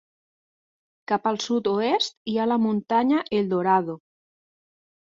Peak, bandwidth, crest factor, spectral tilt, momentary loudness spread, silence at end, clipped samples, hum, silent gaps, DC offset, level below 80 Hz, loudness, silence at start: -8 dBFS; 7.6 kHz; 18 dB; -5 dB/octave; 6 LU; 1.05 s; under 0.1%; none; 2.17-2.25 s; under 0.1%; -68 dBFS; -23 LUFS; 1.1 s